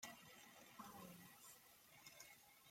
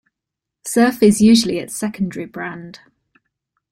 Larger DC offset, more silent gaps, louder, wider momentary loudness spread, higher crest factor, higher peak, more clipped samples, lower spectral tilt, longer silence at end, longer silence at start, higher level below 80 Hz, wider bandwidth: neither; neither; second, -61 LUFS vs -16 LUFS; second, 6 LU vs 17 LU; first, 24 dB vs 16 dB; second, -40 dBFS vs -2 dBFS; neither; second, -2.5 dB/octave vs -4.5 dB/octave; second, 0 s vs 0.95 s; second, 0 s vs 0.65 s; second, -88 dBFS vs -52 dBFS; about the same, 16.5 kHz vs 16 kHz